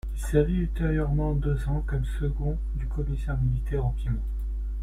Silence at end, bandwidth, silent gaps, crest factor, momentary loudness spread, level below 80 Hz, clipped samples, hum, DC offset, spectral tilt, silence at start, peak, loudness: 0 s; 12.5 kHz; none; 16 dB; 7 LU; -28 dBFS; under 0.1%; none; under 0.1%; -8.5 dB/octave; 0.05 s; -10 dBFS; -28 LUFS